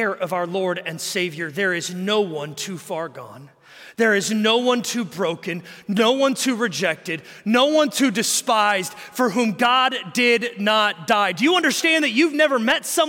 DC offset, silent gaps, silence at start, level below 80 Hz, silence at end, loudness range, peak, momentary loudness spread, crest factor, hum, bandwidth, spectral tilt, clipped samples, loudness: under 0.1%; none; 0 s; -70 dBFS; 0 s; 6 LU; -6 dBFS; 12 LU; 14 dB; none; 17 kHz; -3 dB/octave; under 0.1%; -20 LUFS